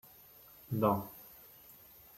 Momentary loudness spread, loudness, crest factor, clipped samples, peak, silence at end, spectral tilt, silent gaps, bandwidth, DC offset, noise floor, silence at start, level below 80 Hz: 23 LU; -34 LUFS; 24 dB; under 0.1%; -14 dBFS; 0.85 s; -8 dB/octave; none; 16.5 kHz; under 0.1%; -58 dBFS; 0.7 s; -70 dBFS